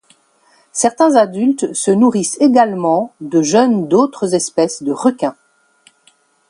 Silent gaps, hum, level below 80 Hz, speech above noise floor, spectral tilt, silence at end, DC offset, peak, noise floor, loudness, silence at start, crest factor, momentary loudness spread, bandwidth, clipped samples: none; none; -64 dBFS; 41 dB; -5 dB/octave; 1.15 s; under 0.1%; 0 dBFS; -55 dBFS; -14 LUFS; 0.75 s; 14 dB; 6 LU; 11.5 kHz; under 0.1%